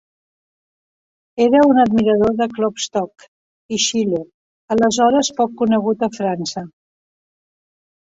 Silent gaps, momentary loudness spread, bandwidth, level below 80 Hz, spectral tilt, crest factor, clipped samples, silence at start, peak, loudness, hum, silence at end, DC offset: 3.28-3.69 s, 4.34-4.68 s; 13 LU; 8 kHz; -54 dBFS; -4 dB/octave; 16 dB; under 0.1%; 1.35 s; -2 dBFS; -17 LUFS; none; 1.4 s; under 0.1%